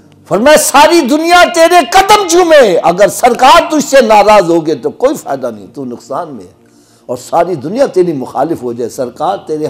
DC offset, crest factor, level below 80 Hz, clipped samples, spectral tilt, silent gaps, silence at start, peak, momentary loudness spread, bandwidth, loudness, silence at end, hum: under 0.1%; 8 dB; -40 dBFS; 0.4%; -3.5 dB/octave; none; 0.3 s; 0 dBFS; 15 LU; 16.5 kHz; -8 LUFS; 0 s; none